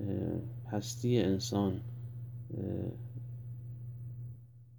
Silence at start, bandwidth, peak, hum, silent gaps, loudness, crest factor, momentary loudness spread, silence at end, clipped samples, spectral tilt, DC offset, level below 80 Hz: 0 s; over 20 kHz; -18 dBFS; none; none; -37 LUFS; 20 dB; 14 LU; 0 s; under 0.1%; -6.5 dB/octave; under 0.1%; -64 dBFS